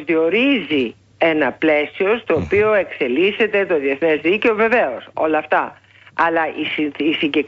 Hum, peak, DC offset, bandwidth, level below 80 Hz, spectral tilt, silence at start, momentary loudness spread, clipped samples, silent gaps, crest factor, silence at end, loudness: none; -4 dBFS; under 0.1%; 7.2 kHz; -52 dBFS; -6.5 dB/octave; 0 s; 5 LU; under 0.1%; none; 14 dB; 0 s; -17 LUFS